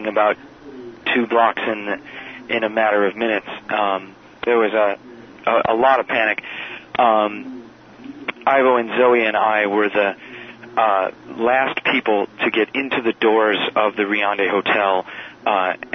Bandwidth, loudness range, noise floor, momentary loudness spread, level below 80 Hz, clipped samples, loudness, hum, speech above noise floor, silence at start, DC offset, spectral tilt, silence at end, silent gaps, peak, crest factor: 6.4 kHz; 2 LU; -40 dBFS; 14 LU; -62 dBFS; under 0.1%; -18 LUFS; none; 22 dB; 0 s; under 0.1%; -6 dB/octave; 0 s; none; -2 dBFS; 16 dB